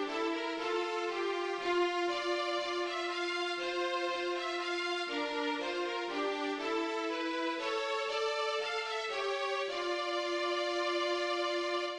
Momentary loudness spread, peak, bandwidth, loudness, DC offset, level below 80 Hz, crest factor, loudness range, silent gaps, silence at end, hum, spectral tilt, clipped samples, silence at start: 2 LU; -22 dBFS; 10.5 kHz; -34 LUFS; under 0.1%; -74 dBFS; 14 dB; 1 LU; none; 0 s; none; -1.5 dB/octave; under 0.1%; 0 s